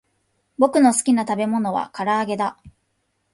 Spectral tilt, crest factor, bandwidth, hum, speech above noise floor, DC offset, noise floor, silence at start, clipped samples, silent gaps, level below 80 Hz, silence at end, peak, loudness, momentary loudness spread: -4.5 dB/octave; 18 dB; 11.5 kHz; none; 51 dB; under 0.1%; -71 dBFS; 0.6 s; under 0.1%; none; -62 dBFS; 0.65 s; -4 dBFS; -20 LUFS; 9 LU